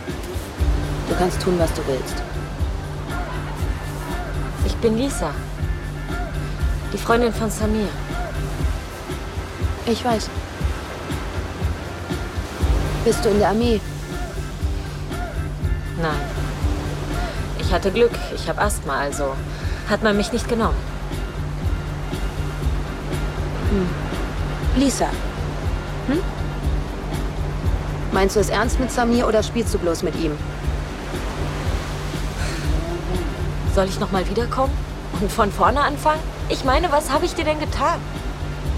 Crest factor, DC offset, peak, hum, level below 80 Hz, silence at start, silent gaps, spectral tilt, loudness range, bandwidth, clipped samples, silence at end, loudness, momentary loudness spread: 20 dB; under 0.1%; -2 dBFS; none; -28 dBFS; 0 s; none; -5.5 dB/octave; 5 LU; 16 kHz; under 0.1%; 0 s; -23 LUFS; 9 LU